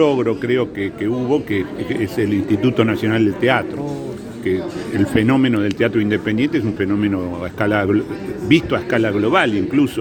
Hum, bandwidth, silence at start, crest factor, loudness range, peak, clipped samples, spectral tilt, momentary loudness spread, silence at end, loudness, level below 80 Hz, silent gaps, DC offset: none; 17.5 kHz; 0 s; 18 dB; 1 LU; 0 dBFS; under 0.1%; -7 dB/octave; 8 LU; 0 s; -18 LUFS; -46 dBFS; none; under 0.1%